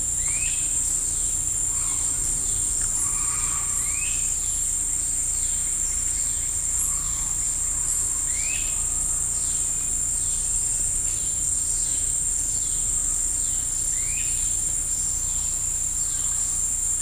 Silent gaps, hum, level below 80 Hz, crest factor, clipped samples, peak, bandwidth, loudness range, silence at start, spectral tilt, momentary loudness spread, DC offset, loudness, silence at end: none; none; -38 dBFS; 14 dB; under 0.1%; -10 dBFS; 15.5 kHz; 1 LU; 0 s; -0.5 dB/octave; 1 LU; under 0.1%; -22 LUFS; 0 s